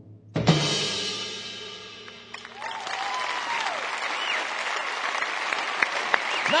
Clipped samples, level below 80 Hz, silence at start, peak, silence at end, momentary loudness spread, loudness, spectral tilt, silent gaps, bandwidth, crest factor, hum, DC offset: under 0.1%; -62 dBFS; 0 s; -2 dBFS; 0 s; 15 LU; -26 LUFS; -3.5 dB/octave; none; 10.5 kHz; 26 dB; none; under 0.1%